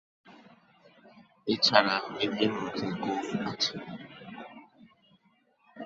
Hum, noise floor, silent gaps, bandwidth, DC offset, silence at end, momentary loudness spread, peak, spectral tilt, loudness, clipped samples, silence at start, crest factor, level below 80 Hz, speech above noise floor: none; -68 dBFS; none; 8 kHz; under 0.1%; 0 s; 22 LU; -2 dBFS; -4 dB/octave; -28 LUFS; under 0.1%; 0.25 s; 30 dB; -70 dBFS; 39 dB